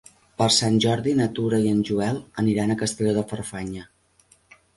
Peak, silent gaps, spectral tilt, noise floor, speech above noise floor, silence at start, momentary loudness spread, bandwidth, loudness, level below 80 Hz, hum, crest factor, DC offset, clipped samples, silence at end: -8 dBFS; none; -5 dB/octave; -60 dBFS; 37 dB; 0.4 s; 13 LU; 11.5 kHz; -23 LUFS; -54 dBFS; none; 16 dB; under 0.1%; under 0.1%; 0.9 s